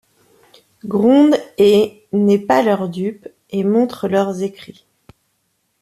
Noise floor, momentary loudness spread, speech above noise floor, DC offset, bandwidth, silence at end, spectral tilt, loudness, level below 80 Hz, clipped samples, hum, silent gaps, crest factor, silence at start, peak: -67 dBFS; 13 LU; 52 dB; under 0.1%; 14 kHz; 1.1 s; -7 dB/octave; -16 LUFS; -60 dBFS; under 0.1%; none; none; 14 dB; 0.85 s; -2 dBFS